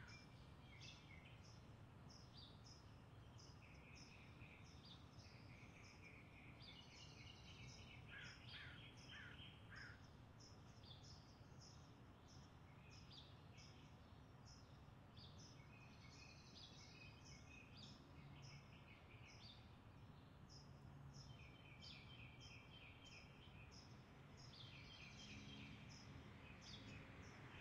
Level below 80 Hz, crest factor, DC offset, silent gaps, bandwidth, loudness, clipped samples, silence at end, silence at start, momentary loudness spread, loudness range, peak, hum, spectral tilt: -74 dBFS; 18 dB; under 0.1%; none; 10 kHz; -62 LUFS; under 0.1%; 0 s; 0 s; 6 LU; 4 LU; -44 dBFS; none; -4.5 dB/octave